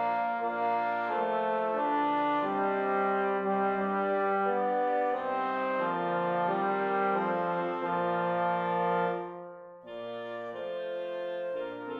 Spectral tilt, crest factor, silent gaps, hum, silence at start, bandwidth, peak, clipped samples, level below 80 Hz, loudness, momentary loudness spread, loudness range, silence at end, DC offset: -8 dB/octave; 12 dB; none; none; 0 s; 5.6 kHz; -18 dBFS; under 0.1%; -78 dBFS; -30 LUFS; 9 LU; 4 LU; 0 s; under 0.1%